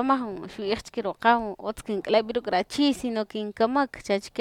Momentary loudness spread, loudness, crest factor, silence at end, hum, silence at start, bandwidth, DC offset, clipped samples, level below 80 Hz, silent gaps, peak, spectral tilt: 10 LU; -26 LUFS; 20 dB; 0 s; none; 0 s; 15 kHz; under 0.1%; under 0.1%; -56 dBFS; none; -6 dBFS; -4.5 dB/octave